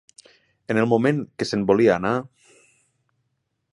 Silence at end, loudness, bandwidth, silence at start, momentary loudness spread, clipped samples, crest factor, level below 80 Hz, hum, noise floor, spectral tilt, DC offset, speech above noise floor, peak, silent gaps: 1.5 s; -21 LUFS; 11.5 kHz; 0.7 s; 8 LU; under 0.1%; 20 dB; -58 dBFS; none; -75 dBFS; -6.5 dB/octave; under 0.1%; 54 dB; -4 dBFS; none